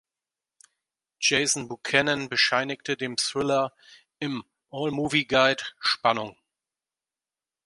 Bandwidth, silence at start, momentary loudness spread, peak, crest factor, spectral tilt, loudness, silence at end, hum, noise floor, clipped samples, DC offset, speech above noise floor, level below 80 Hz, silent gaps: 11.5 kHz; 1.2 s; 11 LU; -4 dBFS; 24 dB; -2.5 dB/octave; -25 LUFS; 1.35 s; none; under -90 dBFS; under 0.1%; under 0.1%; over 64 dB; -64 dBFS; none